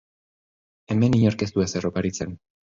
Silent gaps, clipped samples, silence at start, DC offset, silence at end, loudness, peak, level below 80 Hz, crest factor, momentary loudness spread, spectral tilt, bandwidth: none; under 0.1%; 0.9 s; under 0.1%; 0.35 s; -23 LUFS; -6 dBFS; -48 dBFS; 18 dB; 11 LU; -6.5 dB/octave; 7.8 kHz